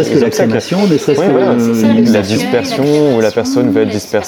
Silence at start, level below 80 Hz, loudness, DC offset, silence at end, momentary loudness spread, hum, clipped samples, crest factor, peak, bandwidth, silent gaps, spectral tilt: 0 s; -52 dBFS; -11 LUFS; under 0.1%; 0 s; 3 LU; none; under 0.1%; 10 dB; 0 dBFS; 18.5 kHz; none; -6 dB/octave